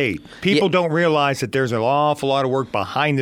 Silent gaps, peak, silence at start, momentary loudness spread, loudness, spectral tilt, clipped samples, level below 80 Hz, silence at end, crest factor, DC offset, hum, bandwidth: none; -4 dBFS; 0 s; 5 LU; -19 LUFS; -5.5 dB/octave; under 0.1%; -56 dBFS; 0 s; 14 dB; under 0.1%; none; 16.5 kHz